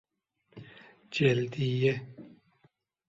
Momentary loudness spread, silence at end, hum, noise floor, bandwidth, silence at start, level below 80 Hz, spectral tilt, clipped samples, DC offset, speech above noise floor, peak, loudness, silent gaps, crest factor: 25 LU; 0.8 s; none; -71 dBFS; 7.8 kHz; 0.55 s; -66 dBFS; -7 dB/octave; under 0.1%; under 0.1%; 44 dB; -12 dBFS; -29 LUFS; none; 20 dB